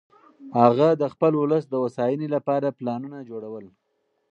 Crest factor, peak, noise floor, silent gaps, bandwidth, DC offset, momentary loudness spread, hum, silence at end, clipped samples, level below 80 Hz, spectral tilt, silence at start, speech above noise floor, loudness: 22 dB; -2 dBFS; -73 dBFS; none; 8 kHz; under 0.1%; 17 LU; none; 0.65 s; under 0.1%; -72 dBFS; -9 dB/octave; 0.4 s; 50 dB; -22 LUFS